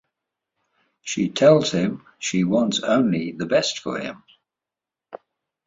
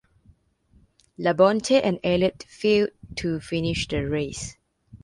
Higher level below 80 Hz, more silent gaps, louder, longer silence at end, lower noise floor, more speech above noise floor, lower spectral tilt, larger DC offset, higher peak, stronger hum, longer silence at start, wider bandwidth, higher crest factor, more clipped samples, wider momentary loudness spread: second, -62 dBFS vs -48 dBFS; neither; about the same, -21 LUFS vs -23 LUFS; first, 0.5 s vs 0.05 s; first, -88 dBFS vs -61 dBFS; first, 67 dB vs 38 dB; about the same, -5 dB/octave vs -5 dB/octave; neither; about the same, -4 dBFS vs -6 dBFS; neither; second, 1.05 s vs 1.2 s; second, 8 kHz vs 11.5 kHz; about the same, 20 dB vs 20 dB; neither; first, 14 LU vs 10 LU